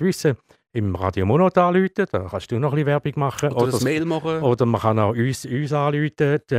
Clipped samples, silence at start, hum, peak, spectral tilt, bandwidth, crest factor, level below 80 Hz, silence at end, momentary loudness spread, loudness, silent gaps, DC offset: under 0.1%; 0 s; none; -4 dBFS; -7 dB/octave; 15.5 kHz; 16 dB; -56 dBFS; 0 s; 8 LU; -21 LUFS; none; under 0.1%